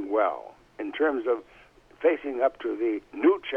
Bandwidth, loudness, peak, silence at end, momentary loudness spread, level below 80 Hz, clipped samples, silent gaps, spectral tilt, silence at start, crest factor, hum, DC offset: 4.8 kHz; -27 LUFS; -10 dBFS; 0 s; 12 LU; -66 dBFS; under 0.1%; none; -6 dB/octave; 0 s; 16 dB; none; under 0.1%